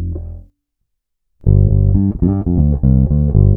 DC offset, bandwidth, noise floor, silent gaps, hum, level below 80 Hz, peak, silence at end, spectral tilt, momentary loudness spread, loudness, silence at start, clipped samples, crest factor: under 0.1%; 1.5 kHz; -72 dBFS; none; none; -20 dBFS; 0 dBFS; 0 s; -16 dB/octave; 12 LU; -14 LUFS; 0 s; under 0.1%; 12 dB